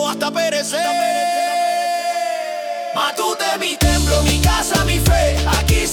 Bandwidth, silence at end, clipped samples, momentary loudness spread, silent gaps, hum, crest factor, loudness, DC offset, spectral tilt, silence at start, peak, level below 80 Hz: 18 kHz; 0 s; under 0.1%; 6 LU; none; none; 14 dB; -17 LUFS; under 0.1%; -4 dB/octave; 0 s; -2 dBFS; -24 dBFS